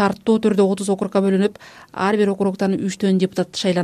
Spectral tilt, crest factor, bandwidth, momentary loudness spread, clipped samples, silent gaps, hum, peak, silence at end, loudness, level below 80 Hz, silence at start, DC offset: -6 dB/octave; 16 dB; 12.5 kHz; 4 LU; under 0.1%; none; none; -4 dBFS; 0 s; -19 LUFS; -60 dBFS; 0 s; under 0.1%